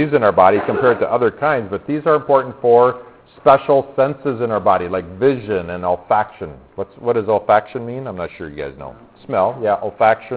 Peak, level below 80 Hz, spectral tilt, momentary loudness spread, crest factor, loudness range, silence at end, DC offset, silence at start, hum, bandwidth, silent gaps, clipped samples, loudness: 0 dBFS; -48 dBFS; -10.5 dB/octave; 15 LU; 16 dB; 5 LU; 0 s; under 0.1%; 0 s; none; 4 kHz; none; under 0.1%; -17 LUFS